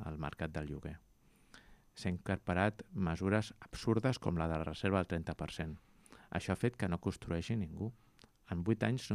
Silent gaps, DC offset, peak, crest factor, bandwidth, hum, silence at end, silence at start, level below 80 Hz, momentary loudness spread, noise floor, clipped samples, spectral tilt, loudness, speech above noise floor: none; under 0.1%; -18 dBFS; 20 dB; 14 kHz; none; 0 s; 0 s; -58 dBFS; 11 LU; -63 dBFS; under 0.1%; -7 dB/octave; -38 LUFS; 26 dB